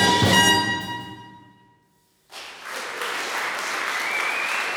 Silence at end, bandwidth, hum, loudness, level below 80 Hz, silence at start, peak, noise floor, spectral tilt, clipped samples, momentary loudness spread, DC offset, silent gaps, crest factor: 0 s; over 20 kHz; none; -21 LUFS; -56 dBFS; 0 s; -4 dBFS; -63 dBFS; -2.5 dB/octave; under 0.1%; 23 LU; under 0.1%; none; 22 dB